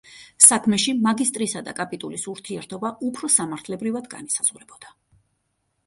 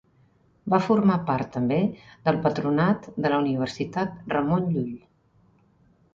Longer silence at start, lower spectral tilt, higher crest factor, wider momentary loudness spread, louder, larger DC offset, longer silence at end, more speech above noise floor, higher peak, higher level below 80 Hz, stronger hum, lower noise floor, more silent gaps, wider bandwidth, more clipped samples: second, 0.1 s vs 0.65 s; second, -2 dB/octave vs -8 dB/octave; first, 24 dB vs 18 dB; first, 18 LU vs 8 LU; first, -20 LUFS vs -25 LUFS; neither; second, 0.95 s vs 1.2 s; first, 50 dB vs 38 dB; first, 0 dBFS vs -6 dBFS; second, -66 dBFS vs -58 dBFS; neither; first, -73 dBFS vs -61 dBFS; neither; first, 16 kHz vs 7.6 kHz; neither